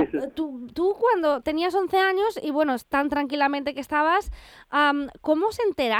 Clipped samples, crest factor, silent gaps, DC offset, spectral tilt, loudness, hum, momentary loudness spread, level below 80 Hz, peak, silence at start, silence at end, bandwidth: under 0.1%; 16 dB; none; under 0.1%; -4.5 dB/octave; -24 LUFS; none; 7 LU; -50 dBFS; -8 dBFS; 0 s; 0 s; 18 kHz